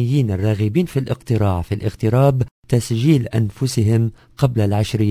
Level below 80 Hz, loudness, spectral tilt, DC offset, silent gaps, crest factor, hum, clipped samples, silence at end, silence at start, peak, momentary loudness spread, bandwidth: -38 dBFS; -19 LUFS; -7.5 dB/octave; under 0.1%; 2.51-2.63 s; 16 dB; none; under 0.1%; 0 s; 0 s; 0 dBFS; 6 LU; 16 kHz